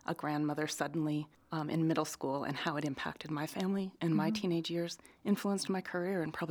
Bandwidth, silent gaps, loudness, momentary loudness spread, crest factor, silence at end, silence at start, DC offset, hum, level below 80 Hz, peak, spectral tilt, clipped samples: over 20 kHz; none; -36 LUFS; 7 LU; 18 dB; 0 s; 0.1 s; under 0.1%; none; -74 dBFS; -18 dBFS; -5.5 dB/octave; under 0.1%